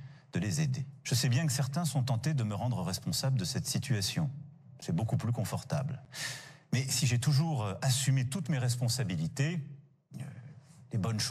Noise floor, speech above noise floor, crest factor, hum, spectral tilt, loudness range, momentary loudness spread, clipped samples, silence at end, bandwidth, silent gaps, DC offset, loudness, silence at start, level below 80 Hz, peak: -52 dBFS; 21 dB; 14 dB; none; -4.5 dB/octave; 3 LU; 13 LU; under 0.1%; 0 s; 15 kHz; none; under 0.1%; -32 LUFS; 0 s; -66 dBFS; -18 dBFS